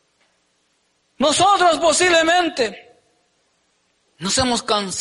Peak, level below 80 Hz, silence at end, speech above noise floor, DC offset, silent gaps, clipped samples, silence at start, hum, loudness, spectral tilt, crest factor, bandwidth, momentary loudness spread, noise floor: -6 dBFS; -50 dBFS; 0 s; 49 dB; under 0.1%; none; under 0.1%; 1.2 s; none; -17 LUFS; -2 dB/octave; 14 dB; 11.5 kHz; 9 LU; -65 dBFS